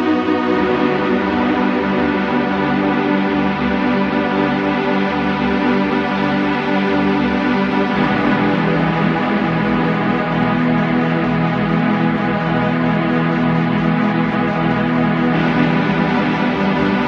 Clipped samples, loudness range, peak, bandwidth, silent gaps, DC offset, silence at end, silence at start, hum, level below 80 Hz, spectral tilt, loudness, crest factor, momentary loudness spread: under 0.1%; 1 LU; -2 dBFS; 6.8 kHz; none; under 0.1%; 0 s; 0 s; none; -42 dBFS; -8 dB/octave; -16 LUFS; 14 dB; 2 LU